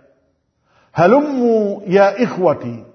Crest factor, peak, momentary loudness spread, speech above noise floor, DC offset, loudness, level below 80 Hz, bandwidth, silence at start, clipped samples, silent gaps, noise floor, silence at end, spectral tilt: 16 dB; 0 dBFS; 6 LU; 49 dB; under 0.1%; -15 LUFS; -60 dBFS; 6.4 kHz; 0.95 s; under 0.1%; none; -63 dBFS; 0.1 s; -7.5 dB/octave